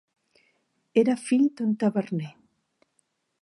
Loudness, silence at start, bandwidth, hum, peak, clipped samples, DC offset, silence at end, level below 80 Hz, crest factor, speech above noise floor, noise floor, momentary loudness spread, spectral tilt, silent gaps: -25 LUFS; 0.95 s; 11.5 kHz; none; -8 dBFS; under 0.1%; under 0.1%; 1.1 s; -80 dBFS; 20 dB; 49 dB; -73 dBFS; 10 LU; -7 dB/octave; none